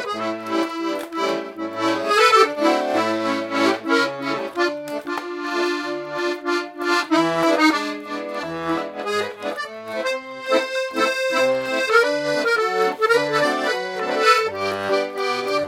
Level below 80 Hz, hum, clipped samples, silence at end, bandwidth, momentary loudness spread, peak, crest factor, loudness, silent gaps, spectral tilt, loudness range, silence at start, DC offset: -68 dBFS; none; under 0.1%; 0 s; 16.5 kHz; 10 LU; -2 dBFS; 20 dB; -21 LUFS; none; -3.5 dB/octave; 4 LU; 0 s; under 0.1%